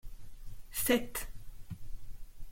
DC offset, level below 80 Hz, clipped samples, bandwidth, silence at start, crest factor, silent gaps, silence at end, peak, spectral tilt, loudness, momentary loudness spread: under 0.1%; -46 dBFS; under 0.1%; 16.5 kHz; 0.05 s; 22 dB; none; 0 s; -16 dBFS; -3.5 dB/octave; -33 LUFS; 26 LU